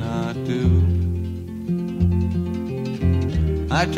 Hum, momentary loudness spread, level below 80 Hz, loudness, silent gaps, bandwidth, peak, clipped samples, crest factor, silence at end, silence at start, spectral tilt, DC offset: none; 8 LU; -30 dBFS; -22 LUFS; none; 8 kHz; -6 dBFS; under 0.1%; 16 dB; 0 s; 0 s; -7.5 dB/octave; under 0.1%